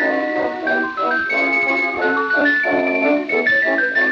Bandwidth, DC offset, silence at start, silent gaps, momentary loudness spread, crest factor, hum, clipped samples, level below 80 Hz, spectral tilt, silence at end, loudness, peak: 7.4 kHz; under 0.1%; 0 s; none; 4 LU; 12 dB; none; under 0.1%; -62 dBFS; -5 dB/octave; 0 s; -17 LUFS; -4 dBFS